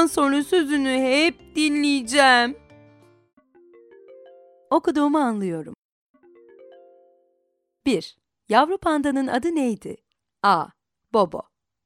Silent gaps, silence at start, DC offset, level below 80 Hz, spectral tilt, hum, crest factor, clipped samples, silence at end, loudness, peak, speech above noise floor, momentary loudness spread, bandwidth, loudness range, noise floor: 5.78-6.14 s; 0 s; under 0.1%; -60 dBFS; -3.5 dB/octave; none; 20 dB; under 0.1%; 0.45 s; -21 LUFS; -2 dBFS; 52 dB; 15 LU; 15 kHz; 7 LU; -72 dBFS